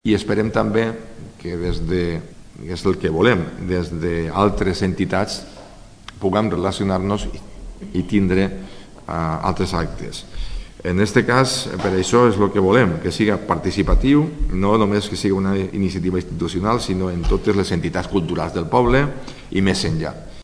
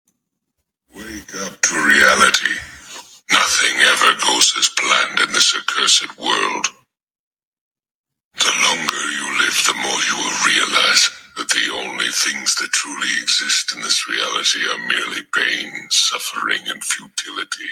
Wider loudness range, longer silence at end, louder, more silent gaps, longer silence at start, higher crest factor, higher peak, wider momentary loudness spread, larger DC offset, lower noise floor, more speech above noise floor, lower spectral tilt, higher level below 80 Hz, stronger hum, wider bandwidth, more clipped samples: about the same, 5 LU vs 5 LU; about the same, 0 s vs 0 s; second, -20 LUFS vs -15 LUFS; second, none vs 7.03-7.07 s, 7.19-7.31 s, 7.43-7.52 s, 7.61-7.71 s, 7.91-8.04 s, 8.25-8.31 s; second, 0.05 s vs 0.95 s; about the same, 20 dB vs 18 dB; about the same, 0 dBFS vs 0 dBFS; first, 16 LU vs 12 LU; neither; second, -41 dBFS vs -75 dBFS; second, 22 dB vs 54 dB; first, -6 dB/octave vs 1 dB/octave; first, -30 dBFS vs -58 dBFS; neither; second, 11 kHz vs 19.5 kHz; neither